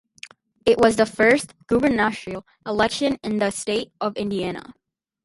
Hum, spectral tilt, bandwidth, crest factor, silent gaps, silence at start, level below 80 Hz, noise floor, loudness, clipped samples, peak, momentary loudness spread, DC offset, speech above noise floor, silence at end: none; -4.5 dB/octave; 11.5 kHz; 20 dB; none; 0.25 s; -52 dBFS; -46 dBFS; -21 LUFS; under 0.1%; -4 dBFS; 17 LU; under 0.1%; 25 dB; 0.55 s